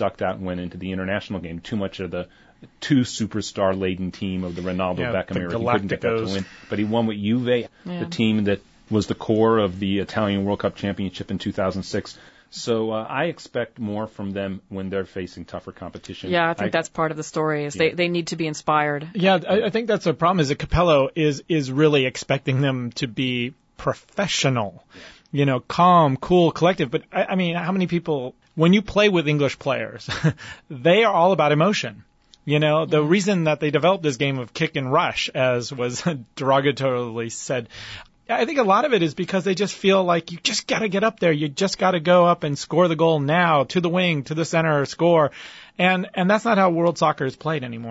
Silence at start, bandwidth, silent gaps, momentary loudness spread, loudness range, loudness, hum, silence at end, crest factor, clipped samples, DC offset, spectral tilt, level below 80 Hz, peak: 0 s; 8 kHz; none; 11 LU; 7 LU; -21 LUFS; none; 0 s; 16 dB; under 0.1%; under 0.1%; -5.5 dB/octave; -50 dBFS; -6 dBFS